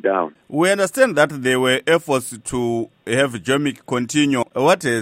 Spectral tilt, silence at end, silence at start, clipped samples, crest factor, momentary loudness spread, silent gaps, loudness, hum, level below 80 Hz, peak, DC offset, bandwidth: -4 dB/octave; 0 s; 0.05 s; under 0.1%; 18 dB; 7 LU; none; -19 LUFS; none; -54 dBFS; -2 dBFS; under 0.1%; 16 kHz